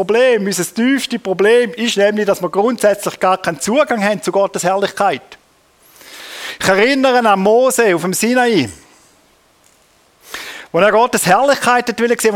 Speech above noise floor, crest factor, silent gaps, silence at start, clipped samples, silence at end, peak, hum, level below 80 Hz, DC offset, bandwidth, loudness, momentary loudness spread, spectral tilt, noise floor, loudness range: 39 dB; 14 dB; none; 0 s; under 0.1%; 0 s; 0 dBFS; none; -56 dBFS; under 0.1%; 17.5 kHz; -14 LUFS; 9 LU; -3.5 dB/octave; -53 dBFS; 4 LU